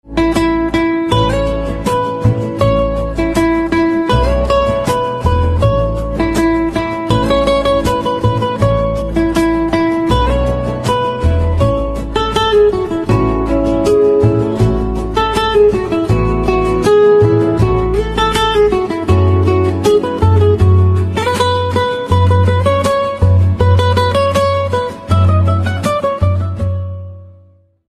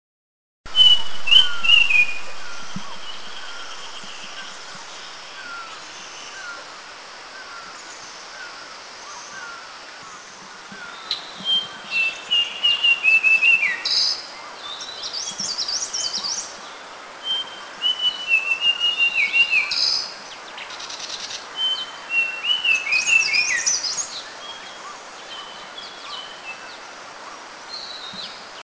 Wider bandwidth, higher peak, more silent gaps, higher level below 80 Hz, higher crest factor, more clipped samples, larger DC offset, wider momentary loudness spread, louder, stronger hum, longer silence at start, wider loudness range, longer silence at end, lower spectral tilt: first, 13 kHz vs 8 kHz; about the same, 0 dBFS vs 0 dBFS; neither; first, -24 dBFS vs -64 dBFS; second, 12 dB vs 22 dB; neither; neither; second, 6 LU vs 22 LU; first, -13 LUFS vs -18 LUFS; neither; second, 0.05 s vs 0.65 s; second, 2 LU vs 18 LU; first, 0.65 s vs 0 s; first, -7 dB/octave vs 1.5 dB/octave